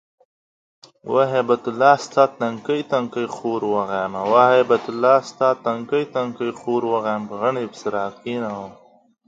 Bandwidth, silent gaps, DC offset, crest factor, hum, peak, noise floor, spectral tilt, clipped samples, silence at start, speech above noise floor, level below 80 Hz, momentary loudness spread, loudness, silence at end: 7.8 kHz; none; under 0.1%; 20 dB; none; 0 dBFS; under -90 dBFS; -5.5 dB/octave; under 0.1%; 1.05 s; over 70 dB; -68 dBFS; 11 LU; -20 LUFS; 0.55 s